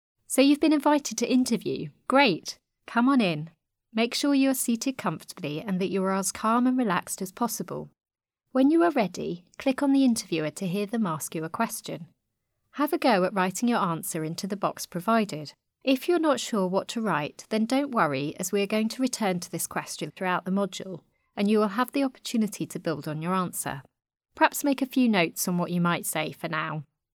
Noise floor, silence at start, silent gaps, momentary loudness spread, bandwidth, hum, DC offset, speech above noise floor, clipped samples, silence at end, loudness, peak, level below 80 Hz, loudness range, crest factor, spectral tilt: -79 dBFS; 0.3 s; none; 12 LU; 19 kHz; none; under 0.1%; 53 dB; under 0.1%; 0.3 s; -26 LUFS; -6 dBFS; -70 dBFS; 3 LU; 22 dB; -4.5 dB/octave